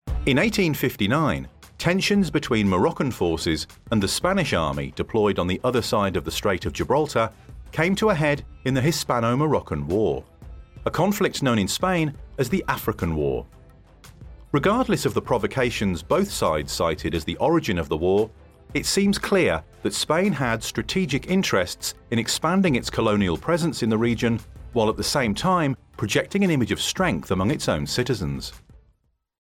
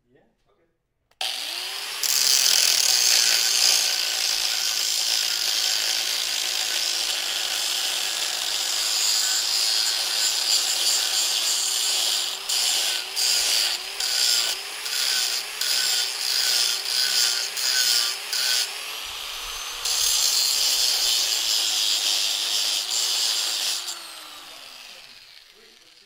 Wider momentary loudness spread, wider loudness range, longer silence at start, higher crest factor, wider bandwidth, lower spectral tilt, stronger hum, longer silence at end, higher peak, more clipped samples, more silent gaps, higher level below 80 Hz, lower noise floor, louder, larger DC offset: second, 6 LU vs 11 LU; about the same, 2 LU vs 4 LU; second, 0.05 s vs 1.2 s; second, 16 dB vs 22 dB; about the same, 16.5 kHz vs 16 kHz; first, -5 dB/octave vs 4 dB/octave; neither; about the same, 0.65 s vs 0.65 s; second, -6 dBFS vs -2 dBFS; neither; neither; first, -42 dBFS vs -62 dBFS; second, -65 dBFS vs -70 dBFS; second, -23 LUFS vs -20 LUFS; neither